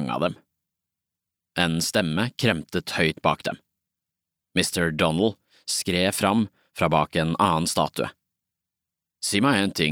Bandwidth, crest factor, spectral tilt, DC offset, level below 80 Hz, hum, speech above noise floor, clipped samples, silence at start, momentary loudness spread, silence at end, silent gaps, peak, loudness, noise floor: 18 kHz; 22 dB; -4 dB/octave; under 0.1%; -54 dBFS; none; 63 dB; under 0.1%; 0 s; 9 LU; 0 s; none; -2 dBFS; -24 LUFS; -87 dBFS